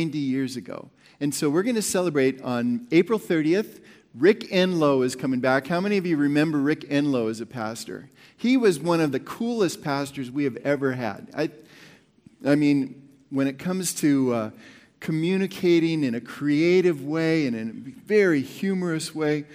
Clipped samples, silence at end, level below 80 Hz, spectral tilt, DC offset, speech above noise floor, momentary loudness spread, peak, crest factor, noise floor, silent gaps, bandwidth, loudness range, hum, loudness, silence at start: under 0.1%; 0 s; -70 dBFS; -5.5 dB/octave; under 0.1%; 31 dB; 11 LU; -6 dBFS; 18 dB; -54 dBFS; none; 16.5 kHz; 4 LU; none; -24 LUFS; 0 s